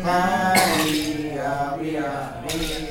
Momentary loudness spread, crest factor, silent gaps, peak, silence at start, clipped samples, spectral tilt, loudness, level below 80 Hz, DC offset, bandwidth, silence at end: 10 LU; 20 dB; none; -4 dBFS; 0 s; under 0.1%; -3.5 dB/octave; -22 LUFS; -42 dBFS; under 0.1%; 19 kHz; 0 s